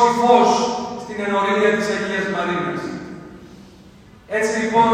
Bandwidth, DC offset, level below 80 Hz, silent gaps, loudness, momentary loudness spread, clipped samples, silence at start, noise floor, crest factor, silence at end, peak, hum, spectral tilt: 15.5 kHz; under 0.1%; -54 dBFS; none; -19 LUFS; 17 LU; under 0.1%; 0 s; -45 dBFS; 18 dB; 0 s; 0 dBFS; none; -4.5 dB/octave